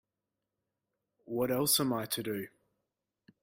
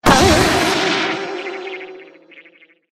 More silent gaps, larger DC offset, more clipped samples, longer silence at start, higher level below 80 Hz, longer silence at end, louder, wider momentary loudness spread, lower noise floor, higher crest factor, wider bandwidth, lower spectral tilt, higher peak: neither; neither; neither; first, 1.3 s vs 0.05 s; second, -72 dBFS vs -34 dBFS; first, 0.95 s vs 0.5 s; second, -32 LUFS vs -15 LUFS; second, 13 LU vs 19 LU; first, -88 dBFS vs -50 dBFS; about the same, 22 dB vs 18 dB; about the same, 16.5 kHz vs 15 kHz; about the same, -3.5 dB/octave vs -3.5 dB/octave; second, -14 dBFS vs 0 dBFS